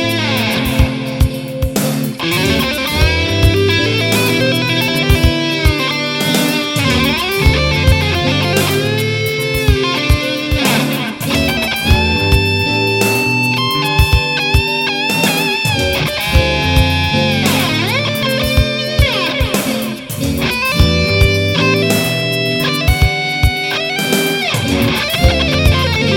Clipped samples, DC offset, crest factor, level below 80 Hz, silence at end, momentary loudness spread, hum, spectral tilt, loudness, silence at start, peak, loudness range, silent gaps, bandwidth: under 0.1%; under 0.1%; 14 dB; -22 dBFS; 0 s; 4 LU; none; -4.5 dB/octave; -13 LUFS; 0 s; 0 dBFS; 2 LU; none; 17.5 kHz